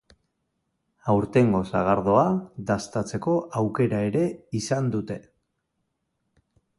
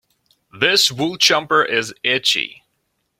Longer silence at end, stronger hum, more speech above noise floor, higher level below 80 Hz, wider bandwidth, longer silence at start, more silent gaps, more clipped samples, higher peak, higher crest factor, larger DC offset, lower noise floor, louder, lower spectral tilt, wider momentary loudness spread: first, 1.6 s vs 0.7 s; neither; about the same, 54 dB vs 53 dB; first, -54 dBFS vs -62 dBFS; second, 11.5 kHz vs 16.5 kHz; first, 1.05 s vs 0.55 s; neither; neither; second, -6 dBFS vs 0 dBFS; about the same, 20 dB vs 20 dB; neither; first, -77 dBFS vs -70 dBFS; second, -24 LUFS vs -16 LUFS; first, -7 dB/octave vs -1.5 dB/octave; first, 10 LU vs 6 LU